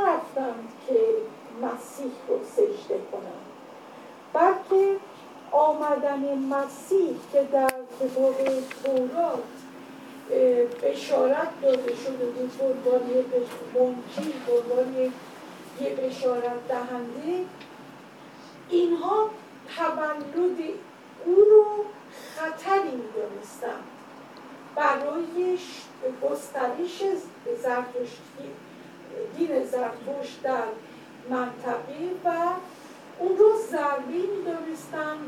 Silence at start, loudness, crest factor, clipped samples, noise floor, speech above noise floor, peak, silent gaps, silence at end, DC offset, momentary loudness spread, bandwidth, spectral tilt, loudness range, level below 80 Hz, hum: 0 s; -26 LUFS; 20 dB; under 0.1%; -46 dBFS; 21 dB; -6 dBFS; none; 0 s; under 0.1%; 21 LU; 15.5 kHz; -5 dB/octave; 7 LU; -78 dBFS; none